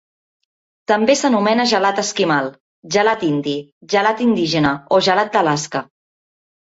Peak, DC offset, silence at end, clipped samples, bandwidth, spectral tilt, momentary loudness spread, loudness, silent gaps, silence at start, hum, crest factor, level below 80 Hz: -2 dBFS; under 0.1%; 0.8 s; under 0.1%; 8 kHz; -4 dB/octave; 10 LU; -17 LUFS; 2.60-2.83 s, 3.72-3.81 s; 0.9 s; none; 16 dB; -58 dBFS